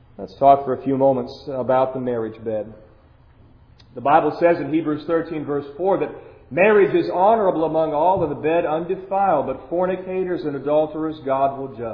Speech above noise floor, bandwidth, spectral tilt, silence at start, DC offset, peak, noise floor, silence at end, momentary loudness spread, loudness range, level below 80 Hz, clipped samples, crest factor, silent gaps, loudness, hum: 31 dB; 5.4 kHz; -9.5 dB/octave; 0.2 s; under 0.1%; 0 dBFS; -50 dBFS; 0 s; 11 LU; 4 LU; -52 dBFS; under 0.1%; 20 dB; none; -20 LUFS; none